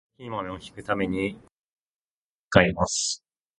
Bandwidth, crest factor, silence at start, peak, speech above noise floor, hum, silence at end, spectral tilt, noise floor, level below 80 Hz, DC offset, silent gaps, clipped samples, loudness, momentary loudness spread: 11.5 kHz; 28 dB; 0.2 s; 0 dBFS; over 65 dB; none; 0.45 s; -4 dB/octave; under -90 dBFS; -48 dBFS; under 0.1%; 1.51-2.51 s; under 0.1%; -25 LUFS; 15 LU